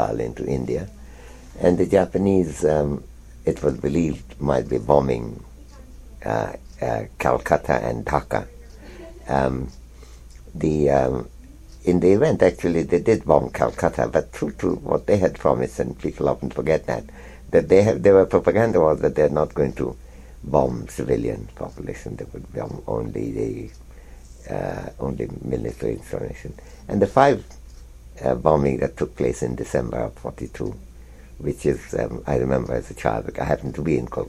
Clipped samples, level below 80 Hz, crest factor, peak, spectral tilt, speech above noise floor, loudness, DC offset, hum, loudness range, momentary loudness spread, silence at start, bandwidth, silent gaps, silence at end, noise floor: under 0.1%; -40 dBFS; 22 dB; 0 dBFS; -7.5 dB/octave; 21 dB; -22 LUFS; under 0.1%; none; 10 LU; 16 LU; 0 s; 14 kHz; none; 0 s; -42 dBFS